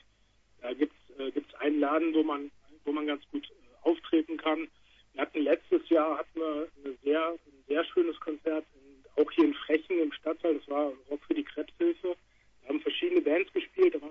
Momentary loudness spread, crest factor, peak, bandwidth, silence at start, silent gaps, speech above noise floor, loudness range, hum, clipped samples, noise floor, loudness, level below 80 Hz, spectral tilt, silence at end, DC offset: 13 LU; 18 dB; -12 dBFS; 5.4 kHz; 0.65 s; none; 36 dB; 2 LU; none; under 0.1%; -66 dBFS; -31 LUFS; -68 dBFS; -6 dB/octave; 0 s; under 0.1%